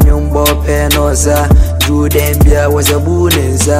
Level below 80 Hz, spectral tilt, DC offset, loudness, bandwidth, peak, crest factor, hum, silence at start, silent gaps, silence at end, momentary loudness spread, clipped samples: -14 dBFS; -5 dB/octave; under 0.1%; -10 LUFS; 16 kHz; 0 dBFS; 8 dB; none; 0 s; none; 0 s; 2 LU; under 0.1%